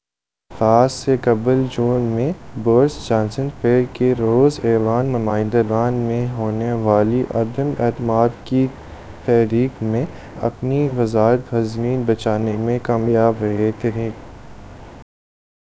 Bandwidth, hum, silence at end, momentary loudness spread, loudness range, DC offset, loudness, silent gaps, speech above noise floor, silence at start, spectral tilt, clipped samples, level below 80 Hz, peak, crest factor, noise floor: 8 kHz; none; 0.6 s; 8 LU; 2 LU; 0.4%; -18 LUFS; none; 69 dB; 0.5 s; -8 dB/octave; under 0.1%; -44 dBFS; 0 dBFS; 18 dB; -86 dBFS